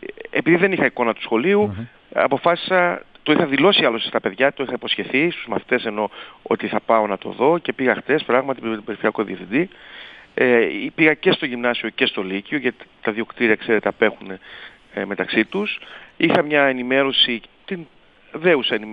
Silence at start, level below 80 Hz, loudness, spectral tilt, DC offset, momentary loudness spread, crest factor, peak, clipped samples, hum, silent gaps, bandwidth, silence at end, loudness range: 0 s; -62 dBFS; -19 LUFS; -7.5 dB/octave; under 0.1%; 14 LU; 18 dB; -2 dBFS; under 0.1%; none; none; 5.4 kHz; 0 s; 3 LU